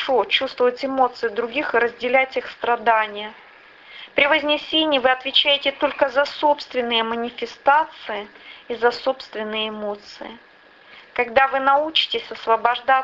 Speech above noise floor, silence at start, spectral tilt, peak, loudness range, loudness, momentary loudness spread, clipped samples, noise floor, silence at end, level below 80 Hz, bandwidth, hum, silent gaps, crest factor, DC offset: 27 dB; 0 s; -3.5 dB/octave; -2 dBFS; 5 LU; -20 LUFS; 14 LU; under 0.1%; -48 dBFS; 0 s; -60 dBFS; 7.6 kHz; none; none; 18 dB; under 0.1%